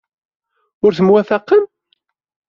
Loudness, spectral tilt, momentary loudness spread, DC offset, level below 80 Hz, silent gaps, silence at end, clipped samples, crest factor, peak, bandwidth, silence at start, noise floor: -14 LUFS; -6 dB/octave; 5 LU; under 0.1%; -60 dBFS; none; 0.85 s; under 0.1%; 14 dB; -2 dBFS; 6.8 kHz; 0.85 s; -65 dBFS